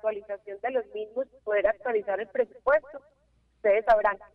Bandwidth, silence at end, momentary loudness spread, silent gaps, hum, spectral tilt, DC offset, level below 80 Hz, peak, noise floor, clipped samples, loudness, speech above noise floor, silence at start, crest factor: 5.8 kHz; 0.1 s; 13 LU; none; none; -6 dB/octave; under 0.1%; -58 dBFS; -10 dBFS; -67 dBFS; under 0.1%; -27 LUFS; 40 dB; 0.05 s; 18 dB